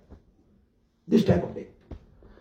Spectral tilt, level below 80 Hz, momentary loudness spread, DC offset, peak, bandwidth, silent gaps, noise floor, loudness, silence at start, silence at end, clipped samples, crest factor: -8 dB/octave; -52 dBFS; 26 LU; under 0.1%; -8 dBFS; 15.5 kHz; none; -66 dBFS; -25 LUFS; 0.1 s; 0.45 s; under 0.1%; 22 dB